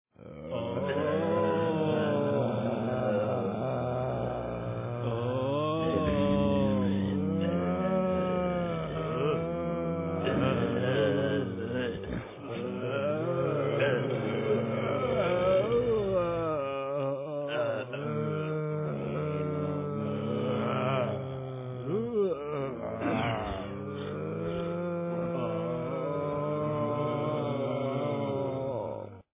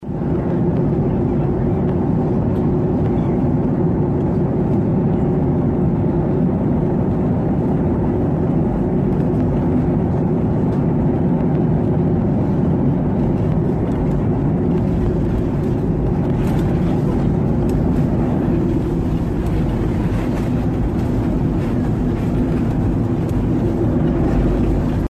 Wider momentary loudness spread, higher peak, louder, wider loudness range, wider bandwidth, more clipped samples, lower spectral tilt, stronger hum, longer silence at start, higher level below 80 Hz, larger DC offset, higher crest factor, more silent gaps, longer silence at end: first, 7 LU vs 2 LU; second, -14 dBFS vs -6 dBFS; second, -31 LUFS vs -18 LUFS; about the same, 4 LU vs 2 LU; second, 3.8 kHz vs 8.8 kHz; neither; second, -6.5 dB/octave vs -10.5 dB/octave; neither; first, 0.2 s vs 0 s; second, -52 dBFS vs -28 dBFS; neither; first, 16 dB vs 10 dB; neither; first, 0.15 s vs 0 s